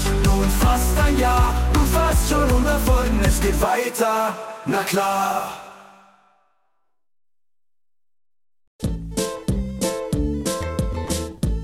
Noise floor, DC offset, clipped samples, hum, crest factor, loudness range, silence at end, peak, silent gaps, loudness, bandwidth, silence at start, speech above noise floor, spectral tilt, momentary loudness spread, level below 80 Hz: under -90 dBFS; under 0.1%; under 0.1%; none; 14 dB; 13 LU; 0 s; -6 dBFS; 8.67-8.79 s; -21 LUFS; 17 kHz; 0 s; over 72 dB; -5 dB/octave; 8 LU; -24 dBFS